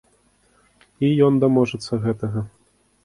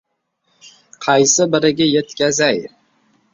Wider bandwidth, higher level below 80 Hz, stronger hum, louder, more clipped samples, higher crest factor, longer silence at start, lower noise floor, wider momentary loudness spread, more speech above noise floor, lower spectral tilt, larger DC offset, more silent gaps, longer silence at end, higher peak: first, 11.5 kHz vs 7.8 kHz; about the same, -54 dBFS vs -58 dBFS; neither; second, -20 LUFS vs -15 LUFS; neither; about the same, 18 dB vs 16 dB; about the same, 1 s vs 1 s; second, -60 dBFS vs -67 dBFS; about the same, 12 LU vs 12 LU; second, 41 dB vs 52 dB; first, -8 dB/octave vs -3 dB/octave; neither; neither; about the same, 0.55 s vs 0.65 s; second, -4 dBFS vs 0 dBFS